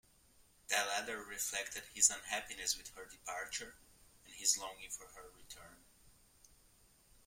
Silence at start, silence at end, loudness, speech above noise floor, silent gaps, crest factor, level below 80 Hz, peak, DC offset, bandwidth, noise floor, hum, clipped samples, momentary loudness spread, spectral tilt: 0.7 s; 1.15 s; -37 LUFS; 27 dB; none; 30 dB; -70 dBFS; -14 dBFS; under 0.1%; 16.5 kHz; -68 dBFS; none; under 0.1%; 23 LU; 1.5 dB/octave